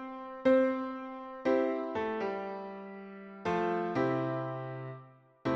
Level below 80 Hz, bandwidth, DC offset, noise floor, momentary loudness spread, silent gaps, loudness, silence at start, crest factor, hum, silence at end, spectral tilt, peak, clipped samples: -70 dBFS; 7.4 kHz; under 0.1%; -55 dBFS; 17 LU; none; -33 LUFS; 0 s; 18 dB; none; 0 s; -8 dB/octave; -16 dBFS; under 0.1%